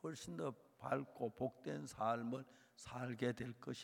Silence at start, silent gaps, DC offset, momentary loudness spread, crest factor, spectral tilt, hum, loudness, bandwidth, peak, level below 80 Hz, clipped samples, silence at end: 0.05 s; none; under 0.1%; 10 LU; 20 dB; -6 dB/octave; none; -45 LUFS; 17 kHz; -24 dBFS; -76 dBFS; under 0.1%; 0 s